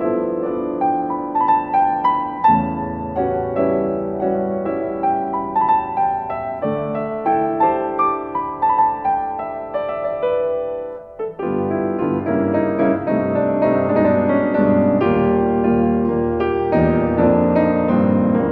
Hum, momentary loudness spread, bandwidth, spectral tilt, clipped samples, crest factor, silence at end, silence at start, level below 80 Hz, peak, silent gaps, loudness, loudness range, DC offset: none; 7 LU; 4.8 kHz; -11 dB/octave; under 0.1%; 16 dB; 0 s; 0 s; -44 dBFS; -2 dBFS; none; -18 LUFS; 4 LU; under 0.1%